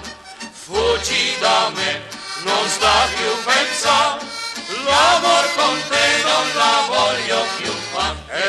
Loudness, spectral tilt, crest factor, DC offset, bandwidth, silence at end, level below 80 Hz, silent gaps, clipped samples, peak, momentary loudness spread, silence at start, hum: -17 LUFS; -1 dB/octave; 16 dB; under 0.1%; 15 kHz; 0 s; -44 dBFS; none; under 0.1%; -2 dBFS; 11 LU; 0 s; none